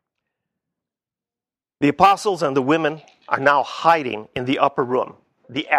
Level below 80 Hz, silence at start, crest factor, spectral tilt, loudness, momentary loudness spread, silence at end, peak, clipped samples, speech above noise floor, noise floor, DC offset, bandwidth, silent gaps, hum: -58 dBFS; 1.8 s; 20 dB; -5 dB/octave; -19 LUFS; 12 LU; 0 s; 0 dBFS; under 0.1%; over 71 dB; under -90 dBFS; under 0.1%; 15 kHz; none; none